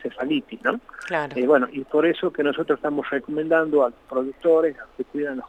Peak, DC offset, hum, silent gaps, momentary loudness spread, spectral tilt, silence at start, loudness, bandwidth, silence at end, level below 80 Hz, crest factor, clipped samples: -6 dBFS; under 0.1%; none; none; 8 LU; -6.5 dB/octave; 0 s; -23 LUFS; 9 kHz; 0 s; -60 dBFS; 18 dB; under 0.1%